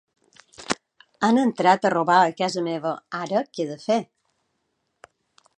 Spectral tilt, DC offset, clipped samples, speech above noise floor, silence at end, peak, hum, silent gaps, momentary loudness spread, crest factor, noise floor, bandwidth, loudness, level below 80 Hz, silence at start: -5 dB/octave; under 0.1%; under 0.1%; 53 dB; 1.55 s; -4 dBFS; none; none; 11 LU; 20 dB; -74 dBFS; 10.5 kHz; -23 LUFS; -72 dBFS; 0.6 s